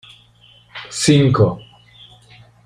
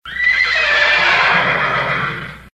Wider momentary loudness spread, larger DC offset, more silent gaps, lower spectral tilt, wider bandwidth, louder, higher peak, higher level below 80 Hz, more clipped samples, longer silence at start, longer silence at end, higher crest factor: first, 22 LU vs 8 LU; neither; neither; first, -5.5 dB/octave vs -3 dB/octave; first, 15 kHz vs 12.5 kHz; about the same, -15 LUFS vs -13 LUFS; about the same, -2 dBFS vs -2 dBFS; about the same, -48 dBFS vs -44 dBFS; neither; first, 0.75 s vs 0.05 s; first, 1.05 s vs 0.05 s; first, 18 dB vs 12 dB